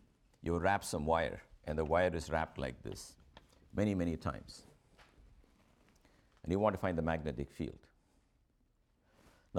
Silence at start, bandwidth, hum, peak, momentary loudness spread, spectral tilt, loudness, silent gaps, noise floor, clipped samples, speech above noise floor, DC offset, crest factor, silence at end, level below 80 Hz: 0.4 s; 16.5 kHz; none; -18 dBFS; 16 LU; -6 dB/octave; -37 LUFS; none; -74 dBFS; under 0.1%; 38 dB; under 0.1%; 22 dB; 0 s; -54 dBFS